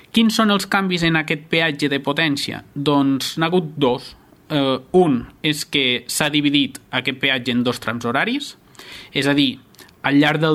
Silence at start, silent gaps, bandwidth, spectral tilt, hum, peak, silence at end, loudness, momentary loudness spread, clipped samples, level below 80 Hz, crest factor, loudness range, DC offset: 0.15 s; none; 15.5 kHz; -4.5 dB/octave; none; 0 dBFS; 0 s; -19 LUFS; 8 LU; under 0.1%; -54 dBFS; 20 dB; 2 LU; under 0.1%